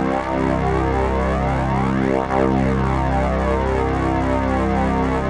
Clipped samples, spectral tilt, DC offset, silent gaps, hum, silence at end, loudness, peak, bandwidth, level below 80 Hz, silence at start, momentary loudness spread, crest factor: under 0.1%; -8 dB/octave; 0.1%; none; none; 0 s; -19 LUFS; -4 dBFS; 10.5 kHz; -26 dBFS; 0 s; 2 LU; 14 dB